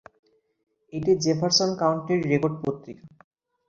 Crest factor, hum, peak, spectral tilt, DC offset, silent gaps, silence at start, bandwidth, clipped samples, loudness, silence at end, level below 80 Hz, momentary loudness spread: 20 dB; none; -6 dBFS; -4.5 dB/octave; under 0.1%; none; 0.95 s; 7.8 kHz; under 0.1%; -24 LUFS; 0.6 s; -62 dBFS; 15 LU